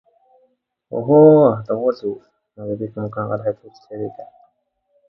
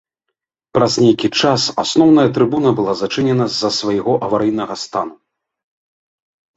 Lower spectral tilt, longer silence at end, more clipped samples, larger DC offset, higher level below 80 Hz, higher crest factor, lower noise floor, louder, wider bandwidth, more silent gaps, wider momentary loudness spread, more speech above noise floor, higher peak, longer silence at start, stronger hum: first, -11.5 dB/octave vs -5 dB/octave; second, 0.85 s vs 1.45 s; neither; neither; second, -62 dBFS vs -54 dBFS; about the same, 18 dB vs 16 dB; second, -67 dBFS vs -78 dBFS; about the same, -17 LUFS vs -15 LUFS; second, 5.8 kHz vs 8 kHz; neither; first, 22 LU vs 10 LU; second, 50 dB vs 63 dB; about the same, 0 dBFS vs 0 dBFS; first, 0.9 s vs 0.75 s; neither